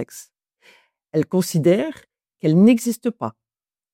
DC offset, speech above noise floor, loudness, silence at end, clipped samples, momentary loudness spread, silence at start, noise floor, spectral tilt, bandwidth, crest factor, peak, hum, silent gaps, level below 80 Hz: under 0.1%; over 72 dB; -19 LUFS; 0.65 s; under 0.1%; 17 LU; 0 s; under -90 dBFS; -6.5 dB/octave; 16.5 kHz; 16 dB; -4 dBFS; none; none; -68 dBFS